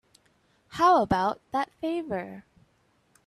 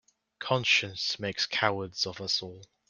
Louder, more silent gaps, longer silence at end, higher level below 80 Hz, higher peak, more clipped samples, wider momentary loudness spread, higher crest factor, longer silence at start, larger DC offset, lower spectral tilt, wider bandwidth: about the same, -26 LUFS vs -28 LUFS; neither; first, 0.85 s vs 0.25 s; first, -56 dBFS vs -70 dBFS; about the same, -10 dBFS vs -8 dBFS; neither; first, 21 LU vs 8 LU; second, 18 dB vs 24 dB; first, 0.7 s vs 0.4 s; neither; first, -6 dB/octave vs -2.5 dB/octave; about the same, 13 kHz vs 12 kHz